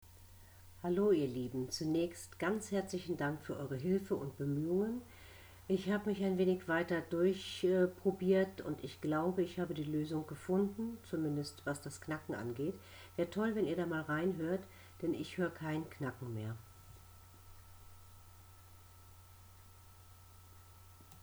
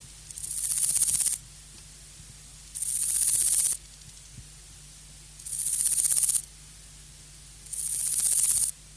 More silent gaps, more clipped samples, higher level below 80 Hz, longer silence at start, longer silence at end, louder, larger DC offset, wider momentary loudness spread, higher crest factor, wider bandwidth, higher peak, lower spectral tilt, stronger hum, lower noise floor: neither; neither; second, -66 dBFS vs -54 dBFS; about the same, 0 s vs 0 s; about the same, 0.05 s vs 0 s; second, -38 LUFS vs -23 LUFS; neither; second, 11 LU vs 25 LU; about the same, 18 dB vs 22 dB; first, over 20 kHz vs 11 kHz; second, -20 dBFS vs -8 dBFS; first, -6.5 dB/octave vs 1 dB/octave; neither; first, -59 dBFS vs -48 dBFS